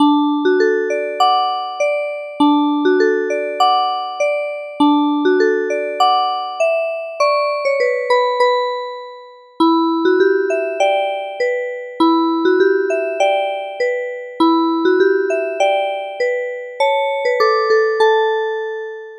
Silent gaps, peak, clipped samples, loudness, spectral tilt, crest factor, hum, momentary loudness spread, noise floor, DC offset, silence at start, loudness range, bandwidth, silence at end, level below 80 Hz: none; -2 dBFS; under 0.1%; -16 LUFS; -3 dB/octave; 14 dB; none; 8 LU; -38 dBFS; under 0.1%; 0 s; 1 LU; 11.5 kHz; 0 s; -72 dBFS